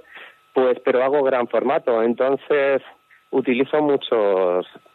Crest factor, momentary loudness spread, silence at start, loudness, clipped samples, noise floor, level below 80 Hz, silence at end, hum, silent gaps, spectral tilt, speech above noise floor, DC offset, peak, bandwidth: 14 dB; 5 LU; 0.15 s; -20 LUFS; under 0.1%; -44 dBFS; -76 dBFS; 0.3 s; none; none; -8 dB/octave; 25 dB; under 0.1%; -6 dBFS; 4.3 kHz